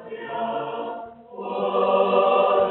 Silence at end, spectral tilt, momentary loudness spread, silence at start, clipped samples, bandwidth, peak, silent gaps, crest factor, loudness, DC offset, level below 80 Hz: 0 s; -3 dB/octave; 17 LU; 0 s; under 0.1%; 4.1 kHz; -8 dBFS; none; 16 dB; -22 LUFS; under 0.1%; -68 dBFS